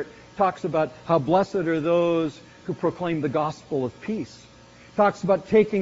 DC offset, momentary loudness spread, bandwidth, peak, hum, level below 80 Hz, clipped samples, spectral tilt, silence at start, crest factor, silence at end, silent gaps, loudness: under 0.1%; 11 LU; 7.6 kHz; -6 dBFS; none; -58 dBFS; under 0.1%; -6 dB/octave; 0 s; 18 dB; 0 s; none; -24 LUFS